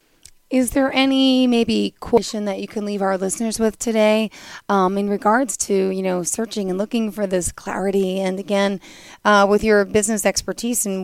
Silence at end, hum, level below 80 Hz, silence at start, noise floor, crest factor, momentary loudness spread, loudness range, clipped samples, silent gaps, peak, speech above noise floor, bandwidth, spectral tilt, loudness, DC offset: 0 s; none; -46 dBFS; 0.5 s; -50 dBFS; 16 dB; 8 LU; 3 LU; under 0.1%; none; -2 dBFS; 31 dB; 16 kHz; -4 dB/octave; -19 LUFS; under 0.1%